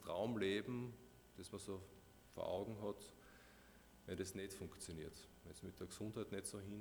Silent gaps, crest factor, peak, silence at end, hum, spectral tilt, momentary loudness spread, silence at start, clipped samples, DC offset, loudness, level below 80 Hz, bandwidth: none; 20 dB; -30 dBFS; 0 s; none; -5 dB/octave; 21 LU; 0 s; under 0.1%; under 0.1%; -48 LUFS; -70 dBFS; over 20 kHz